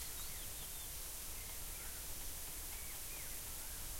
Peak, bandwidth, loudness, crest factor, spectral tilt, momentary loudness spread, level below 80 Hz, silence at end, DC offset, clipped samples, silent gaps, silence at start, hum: -34 dBFS; 16.5 kHz; -45 LUFS; 12 dB; -1 dB/octave; 1 LU; -54 dBFS; 0 s; under 0.1%; under 0.1%; none; 0 s; none